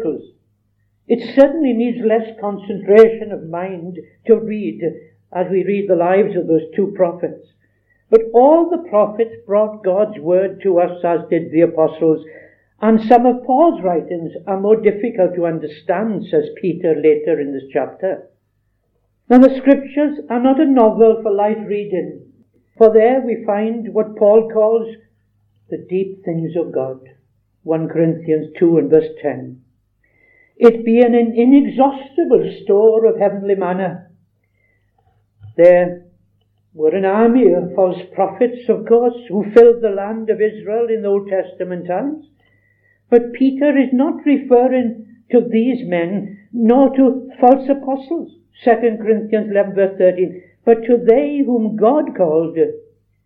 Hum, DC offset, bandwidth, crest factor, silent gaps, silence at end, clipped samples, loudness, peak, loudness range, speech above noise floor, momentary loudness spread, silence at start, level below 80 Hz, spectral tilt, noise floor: none; under 0.1%; 4.7 kHz; 16 dB; none; 0.45 s; 0.1%; -15 LUFS; 0 dBFS; 4 LU; 50 dB; 13 LU; 0 s; -58 dBFS; -9.5 dB/octave; -65 dBFS